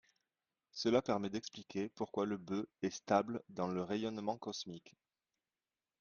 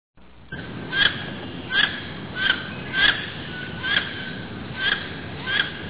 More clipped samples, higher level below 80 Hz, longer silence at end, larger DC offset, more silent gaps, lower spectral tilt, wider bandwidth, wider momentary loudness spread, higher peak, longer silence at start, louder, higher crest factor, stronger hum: neither; second, -76 dBFS vs -48 dBFS; first, 1.1 s vs 0 s; second, under 0.1% vs 0.4%; neither; first, -5.5 dB/octave vs -0.5 dB/octave; first, 7.2 kHz vs 4 kHz; second, 10 LU vs 15 LU; second, -18 dBFS vs -2 dBFS; first, 0.75 s vs 0.15 s; second, -39 LUFS vs -23 LUFS; about the same, 24 dB vs 24 dB; neither